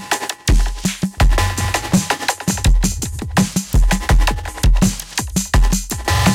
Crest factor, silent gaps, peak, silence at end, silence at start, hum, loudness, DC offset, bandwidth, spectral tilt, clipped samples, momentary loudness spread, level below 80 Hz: 12 dB; none; -4 dBFS; 0 s; 0 s; none; -18 LUFS; under 0.1%; 16.5 kHz; -4 dB/octave; under 0.1%; 5 LU; -18 dBFS